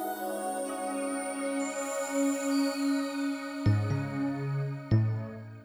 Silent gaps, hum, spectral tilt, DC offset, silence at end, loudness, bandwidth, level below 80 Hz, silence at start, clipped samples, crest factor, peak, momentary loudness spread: none; none; -6 dB/octave; under 0.1%; 0 s; -31 LUFS; over 20 kHz; -56 dBFS; 0 s; under 0.1%; 16 dB; -14 dBFS; 6 LU